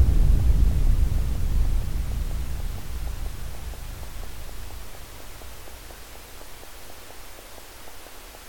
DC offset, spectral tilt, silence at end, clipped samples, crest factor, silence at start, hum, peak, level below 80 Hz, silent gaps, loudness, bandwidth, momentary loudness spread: 2%; -5.5 dB/octave; 0 s; under 0.1%; 18 dB; 0 s; none; -8 dBFS; -26 dBFS; none; -28 LUFS; 17.5 kHz; 20 LU